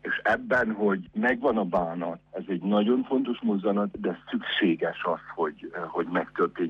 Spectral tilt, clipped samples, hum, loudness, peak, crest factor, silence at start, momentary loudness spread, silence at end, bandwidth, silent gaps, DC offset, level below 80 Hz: -7.5 dB/octave; under 0.1%; 50 Hz at -65 dBFS; -27 LUFS; -12 dBFS; 14 dB; 0.05 s; 9 LU; 0 s; 6.8 kHz; none; under 0.1%; -62 dBFS